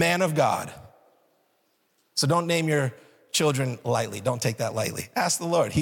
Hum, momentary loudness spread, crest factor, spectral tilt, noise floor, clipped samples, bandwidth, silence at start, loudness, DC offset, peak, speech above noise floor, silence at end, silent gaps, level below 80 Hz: none; 7 LU; 18 dB; -4 dB/octave; -69 dBFS; under 0.1%; 18 kHz; 0 s; -25 LUFS; under 0.1%; -8 dBFS; 45 dB; 0 s; none; -60 dBFS